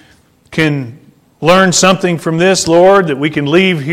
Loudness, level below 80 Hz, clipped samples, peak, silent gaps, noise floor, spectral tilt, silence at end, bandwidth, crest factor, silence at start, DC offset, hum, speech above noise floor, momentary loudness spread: -10 LUFS; -46 dBFS; under 0.1%; 0 dBFS; none; -48 dBFS; -4.5 dB/octave; 0 s; 15.5 kHz; 12 dB; 0.5 s; under 0.1%; none; 38 dB; 9 LU